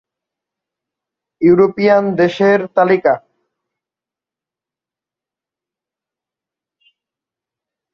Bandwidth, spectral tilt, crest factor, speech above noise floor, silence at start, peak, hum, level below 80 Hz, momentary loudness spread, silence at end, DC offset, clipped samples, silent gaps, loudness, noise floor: 6.8 kHz; -8 dB/octave; 18 dB; 76 dB; 1.4 s; 0 dBFS; none; -60 dBFS; 5 LU; 4.75 s; under 0.1%; under 0.1%; none; -13 LUFS; -88 dBFS